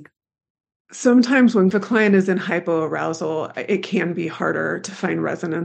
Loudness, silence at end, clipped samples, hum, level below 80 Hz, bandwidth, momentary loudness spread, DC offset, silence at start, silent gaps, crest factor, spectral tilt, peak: -19 LUFS; 0 s; under 0.1%; none; -72 dBFS; 8.8 kHz; 10 LU; under 0.1%; 0 s; 0.50-0.55 s, 0.76-0.85 s; 18 dB; -6 dB/octave; -2 dBFS